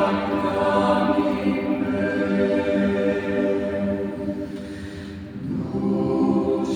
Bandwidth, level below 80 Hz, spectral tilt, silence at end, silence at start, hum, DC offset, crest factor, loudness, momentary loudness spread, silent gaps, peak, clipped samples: 10 kHz; -52 dBFS; -7.5 dB/octave; 0 s; 0 s; none; under 0.1%; 16 dB; -23 LUFS; 13 LU; none; -6 dBFS; under 0.1%